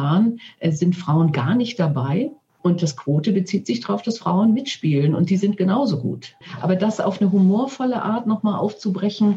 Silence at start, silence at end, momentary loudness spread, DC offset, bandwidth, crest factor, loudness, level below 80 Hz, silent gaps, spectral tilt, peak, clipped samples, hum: 0 s; 0 s; 6 LU; under 0.1%; 8 kHz; 14 dB; -20 LUFS; -68 dBFS; none; -7.5 dB/octave; -6 dBFS; under 0.1%; none